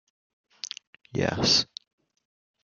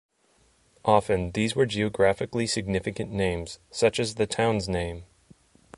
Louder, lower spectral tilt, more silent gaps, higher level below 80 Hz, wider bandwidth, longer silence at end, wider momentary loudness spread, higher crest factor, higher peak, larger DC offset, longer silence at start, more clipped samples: about the same, -24 LUFS vs -26 LUFS; second, -3 dB/octave vs -5 dB/octave; neither; second, -58 dBFS vs -46 dBFS; about the same, 12 kHz vs 11.5 kHz; first, 1 s vs 0.75 s; first, 20 LU vs 8 LU; about the same, 22 dB vs 20 dB; about the same, -8 dBFS vs -6 dBFS; neither; first, 1.15 s vs 0.85 s; neither